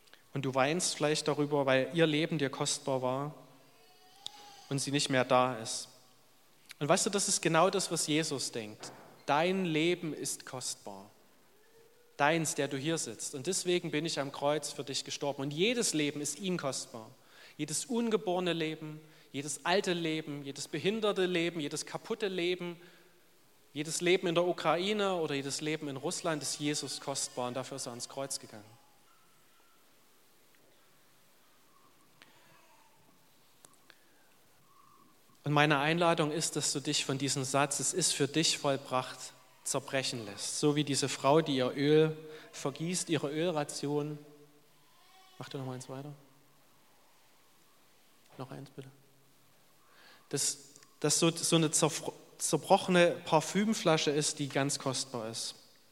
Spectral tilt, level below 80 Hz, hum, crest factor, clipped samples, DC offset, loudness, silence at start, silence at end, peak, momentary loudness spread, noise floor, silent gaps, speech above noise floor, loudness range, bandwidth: -3.5 dB/octave; -82 dBFS; none; 24 dB; under 0.1%; under 0.1%; -32 LUFS; 0.35 s; 0.4 s; -10 dBFS; 16 LU; -66 dBFS; none; 34 dB; 11 LU; 16.5 kHz